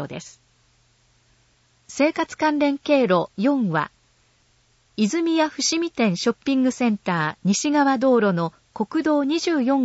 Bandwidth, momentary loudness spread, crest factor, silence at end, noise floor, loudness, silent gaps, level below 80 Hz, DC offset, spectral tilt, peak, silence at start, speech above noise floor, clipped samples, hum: 8 kHz; 8 LU; 16 dB; 0 s; -61 dBFS; -21 LUFS; none; -64 dBFS; under 0.1%; -4.5 dB/octave; -6 dBFS; 0 s; 41 dB; under 0.1%; none